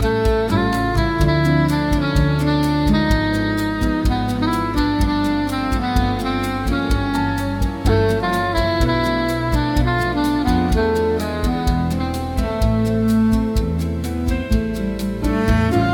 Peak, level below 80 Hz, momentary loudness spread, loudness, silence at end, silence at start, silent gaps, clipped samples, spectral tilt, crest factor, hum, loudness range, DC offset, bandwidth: -2 dBFS; -24 dBFS; 5 LU; -19 LUFS; 0 s; 0 s; none; under 0.1%; -6.5 dB/octave; 16 dB; none; 2 LU; under 0.1%; 18 kHz